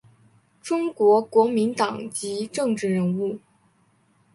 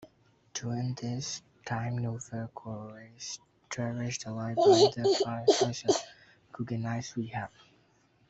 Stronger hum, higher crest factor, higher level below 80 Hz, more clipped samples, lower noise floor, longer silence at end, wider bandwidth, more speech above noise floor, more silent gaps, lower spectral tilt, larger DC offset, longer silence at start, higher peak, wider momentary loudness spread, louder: neither; about the same, 18 dB vs 20 dB; about the same, -70 dBFS vs -68 dBFS; neither; second, -63 dBFS vs -67 dBFS; about the same, 0.95 s vs 0.85 s; first, 11.5 kHz vs 8.2 kHz; first, 41 dB vs 37 dB; neither; about the same, -5.5 dB/octave vs -5 dB/octave; neither; first, 0.65 s vs 0 s; first, -6 dBFS vs -10 dBFS; second, 11 LU vs 18 LU; first, -23 LUFS vs -30 LUFS